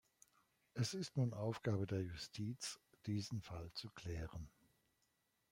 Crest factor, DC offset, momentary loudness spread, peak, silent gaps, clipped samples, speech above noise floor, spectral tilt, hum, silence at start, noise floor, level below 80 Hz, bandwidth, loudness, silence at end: 18 dB; under 0.1%; 11 LU; -28 dBFS; none; under 0.1%; 39 dB; -5.5 dB/octave; none; 0.75 s; -83 dBFS; -66 dBFS; 16 kHz; -45 LUFS; 1.05 s